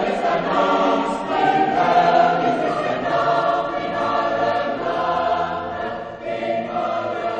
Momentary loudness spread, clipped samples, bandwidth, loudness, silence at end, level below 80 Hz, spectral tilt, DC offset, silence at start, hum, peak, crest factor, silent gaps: 9 LU; under 0.1%; 9 kHz; -20 LUFS; 0 s; -52 dBFS; -5.5 dB/octave; under 0.1%; 0 s; none; -4 dBFS; 16 dB; none